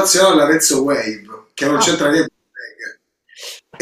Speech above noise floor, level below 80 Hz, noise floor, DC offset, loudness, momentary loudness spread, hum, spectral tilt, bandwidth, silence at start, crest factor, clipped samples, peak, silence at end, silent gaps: 30 dB; -58 dBFS; -45 dBFS; under 0.1%; -14 LUFS; 22 LU; none; -2.5 dB/octave; 16 kHz; 0 s; 16 dB; under 0.1%; 0 dBFS; 0.25 s; none